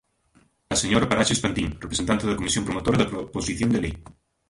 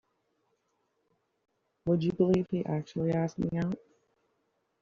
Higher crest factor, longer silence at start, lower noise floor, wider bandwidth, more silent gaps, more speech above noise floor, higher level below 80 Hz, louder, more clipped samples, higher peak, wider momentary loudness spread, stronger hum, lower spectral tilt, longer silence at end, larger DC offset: about the same, 20 dB vs 20 dB; second, 0.7 s vs 1.85 s; second, -62 dBFS vs -77 dBFS; first, 11.5 kHz vs 7.2 kHz; neither; second, 38 dB vs 48 dB; first, -42 dBFS vs -62 dBFS; first, -24 LUFS vs -31 LUFS; neither; first, -4 dBFS vs -14 dBFS; about the same, 8 LU vs 8 LU; neither; second, -4 dB/octave vs -8.5 dB/octave; second, 0.45 s vs 1.05 s; neither